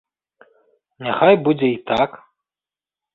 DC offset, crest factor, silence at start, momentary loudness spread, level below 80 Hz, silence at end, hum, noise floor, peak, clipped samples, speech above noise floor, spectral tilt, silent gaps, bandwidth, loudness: under 0.1%; 20 dB; 1 s; 10 LU; -58 dBFS; 1 s; none; under -90 dBFS; -2 dBFS; under 0.1%; over 73 dB; -8 dB/octave; none; 7 kHz; -18 LUFS